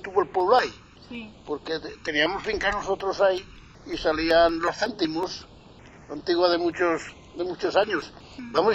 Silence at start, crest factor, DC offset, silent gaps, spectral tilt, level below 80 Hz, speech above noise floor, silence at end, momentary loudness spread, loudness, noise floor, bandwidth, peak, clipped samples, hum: 0 s; 20 dB; under 0.1%; none; -4.5 dB/octave; -50 dBFS; 24 dB; 0 s; 18 LU; -25 LUFS; -48 dBFS; 8.2 kHz; -6 dBFS; under 0.1%; none